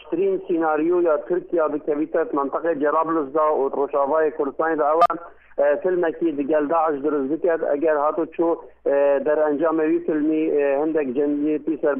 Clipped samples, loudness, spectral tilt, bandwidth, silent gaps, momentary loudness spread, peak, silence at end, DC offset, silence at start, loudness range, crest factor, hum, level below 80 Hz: under 0.1%; -21 LUFS; -8.5 dB/octave; 5.4 kHz; none; 4 LU; -6 dBFS; 0 s; under 0.1%; 0 s; 1 LU; 14 dB; none; -62 dBFS